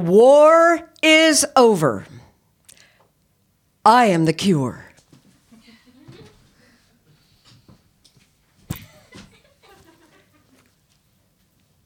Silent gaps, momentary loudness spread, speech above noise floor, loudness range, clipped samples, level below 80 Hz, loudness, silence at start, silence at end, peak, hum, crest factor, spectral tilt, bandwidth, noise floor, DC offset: none; 23 LU; 50 dB; 10 LU; under 0.1%; -60 dBFS; -14 LUFS; 0 s; 3.05 s; -2 dBFS; none; 18 dB; -4 dB/octave; 17.5 kHz; -64 dBFS; under 0.1%